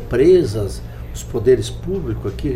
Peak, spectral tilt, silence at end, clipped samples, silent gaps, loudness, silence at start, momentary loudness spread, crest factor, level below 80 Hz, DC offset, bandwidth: -4 dBFS; -7 dB/octave; 0 s; under 0.1%; none; -18 LUFS; 0 s; 18 LU; 14 dB; -30 dBFS; under 0.1%; 14.5 kHz